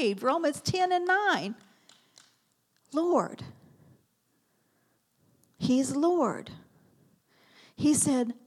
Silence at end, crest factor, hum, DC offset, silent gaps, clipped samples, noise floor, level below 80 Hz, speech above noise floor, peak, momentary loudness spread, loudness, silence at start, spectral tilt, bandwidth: 0.15 s; 18 dB; none; under 0.1%; none; under 0.1%; -73 dBFS; -70 dBFS; 45 dB; -12 dBFS; 15 LU; -27 LUFS; 0 s; -4 dB/octave; 14.5 kHz